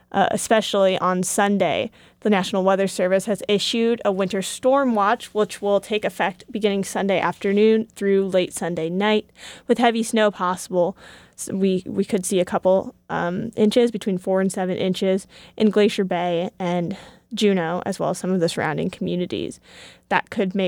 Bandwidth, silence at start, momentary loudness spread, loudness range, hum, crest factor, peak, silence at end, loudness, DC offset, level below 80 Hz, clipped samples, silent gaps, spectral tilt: 17 kHz; 0.15 s; 7 LU; 3 LU; none; 18 dB; -2 dBFS; 0 s; -21 LUFS; under 0.1%; -60 dBFS; under 0.1%; none; -5 dB/octave